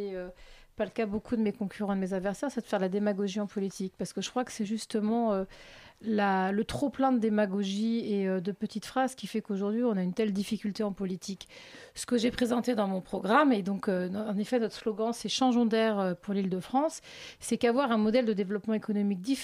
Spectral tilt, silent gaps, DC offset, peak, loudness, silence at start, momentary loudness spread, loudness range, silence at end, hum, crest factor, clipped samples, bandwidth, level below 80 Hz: -5.5 dB/octave; none; under 0.1%; -10 dBFS; -30 LUFS; 0 s; 10 LU; 4 LU; 0 s; none; 20 dB; under 0.1%; 14.5 kHz; -62 dBFS